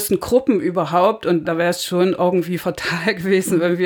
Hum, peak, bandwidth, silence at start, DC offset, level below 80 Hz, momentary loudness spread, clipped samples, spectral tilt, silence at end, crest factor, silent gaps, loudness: none; -2 dBFS; over 20 kHz; 0 s; under 0.1%; -52 dBFS; 4 LU; under 0.1%; -5 dB/octave; 0 s; 16 dB; none; -18 LUFS